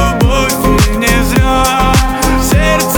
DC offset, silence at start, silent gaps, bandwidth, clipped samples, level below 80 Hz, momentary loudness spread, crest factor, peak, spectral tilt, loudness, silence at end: under 0.1%; 0 s; none; over 20 kHz; under 0.1%; -16 dBFS; 1 LU; 10 dB; 0 dBFS; -4.5 dB/octave; -10 LUFS; 0 s